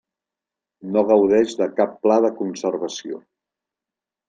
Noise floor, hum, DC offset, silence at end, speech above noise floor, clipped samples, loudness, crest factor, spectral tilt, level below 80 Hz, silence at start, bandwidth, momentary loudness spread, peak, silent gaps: -88 dBFS; none; under 0.1%; 1.1 s; 69 dB; under 0.1%; -20 LUFS; 18 dB; -5.5 dB/octave; -66 dBFS; 0.85 s; 9.2 kHz; 17 LU; -4 dBFS; none